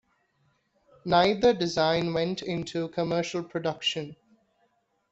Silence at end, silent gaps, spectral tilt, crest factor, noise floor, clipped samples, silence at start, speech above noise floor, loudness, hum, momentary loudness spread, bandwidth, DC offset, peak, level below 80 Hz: 0.95 s; none; -5 dB/octave; 20 dB; -71 dBFS; under 0.1%; 1.05 s; 45 dB; -27 LUFS; none; 9 LU; 8 kHz; under 0.1%; -8 dBFS; -60 dBFS